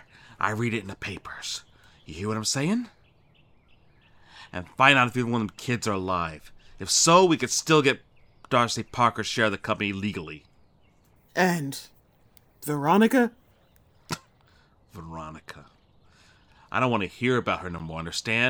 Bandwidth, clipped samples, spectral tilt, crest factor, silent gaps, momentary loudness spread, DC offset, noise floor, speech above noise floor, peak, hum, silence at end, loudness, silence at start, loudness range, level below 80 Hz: over 20 kHz; under 0.1%; -4 dB/octave; 26 dB; none; 20 LU; under 0.1%; -60 dBFS; 35 dB; -2 dBFS; none; 0 s; -25 LUFS; 0.4 s; 10 LU; -60 dBFS